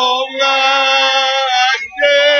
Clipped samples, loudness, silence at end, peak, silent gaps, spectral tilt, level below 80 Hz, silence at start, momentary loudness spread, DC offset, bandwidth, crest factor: under 0.1%; -12 LUFS; 0 s; -2 dBFS; none; 1.5 dB/octave; -62 dBFS; 0 s; 4 LU; under 0.1%; 7 kHz; 12 dB